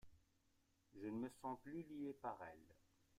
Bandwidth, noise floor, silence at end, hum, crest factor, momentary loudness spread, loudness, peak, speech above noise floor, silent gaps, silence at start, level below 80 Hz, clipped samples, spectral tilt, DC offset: 15.5 kHz; -81 dBFS; 0 s; none; 18 dB; 11 LU; -52 LUFS; -36 dBFS; 30 dB; none; 0.05 s; -80 dBFS; under 0.1%; -7 dB/octave; under 0.1%